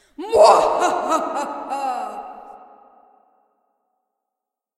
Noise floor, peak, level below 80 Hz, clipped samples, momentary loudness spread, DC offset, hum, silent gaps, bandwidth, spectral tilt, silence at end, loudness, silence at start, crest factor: -84 dBFS; 0 dBFS; -58 dBFS; under 0.1%; 21 LU; under 0.1%; none; none; 13.5 kHz; -2.5 dB/octave; 2.2 s; -18 LUFS; 0.2 s; 20 dB